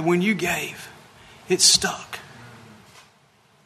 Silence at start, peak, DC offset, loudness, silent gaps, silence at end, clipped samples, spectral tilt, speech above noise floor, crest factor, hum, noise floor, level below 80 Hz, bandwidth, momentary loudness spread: 0 s; -2 dBFS; under 0.1%; -19 LUFS; none; 1.1 s; under 0.1%; -2 dB/octave; 37 dB; 24 dB; none; -58 dBFS; -58 dBFS; 13.5 kHz; 23 LU